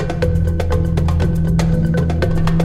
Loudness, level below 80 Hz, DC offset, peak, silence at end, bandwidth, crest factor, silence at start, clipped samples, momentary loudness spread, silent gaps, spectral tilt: -17 LUFS; -22 dBFS; under 0.1%; -4 dBFS; 0 s; 12 kHz; 12 dB; 0 s; under 0.1%; 2 LU; none; -8 dB/octave